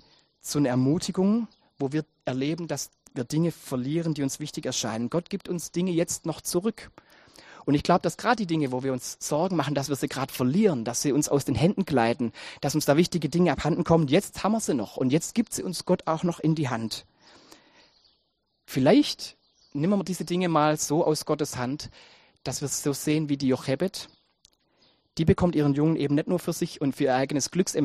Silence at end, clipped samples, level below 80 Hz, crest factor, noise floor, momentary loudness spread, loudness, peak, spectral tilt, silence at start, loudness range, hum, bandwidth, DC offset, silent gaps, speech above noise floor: 0 s; under 0.1%; -54 dBFS; 20 dB; -74 dBFS; 10 LU; -26 LUFS; -6 dBFS; -5.5 dB/octave; 0.45 s; 5 LU; none; 15 kHz; under 0.1%; none; 49 dB